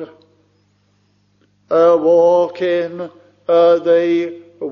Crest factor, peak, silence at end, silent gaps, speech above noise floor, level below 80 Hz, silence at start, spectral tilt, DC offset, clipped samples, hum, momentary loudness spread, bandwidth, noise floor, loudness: 14 dB; -2 dBFS; 0 s; none; 46 dB; -66 dBFS; 0 s; -4.5 dB/octave; under 0.1%; under 0.1%; 50 Hz at -55 dBFS; 18 LU; 6.4 kHz; -59 dBFS; -14 LUFS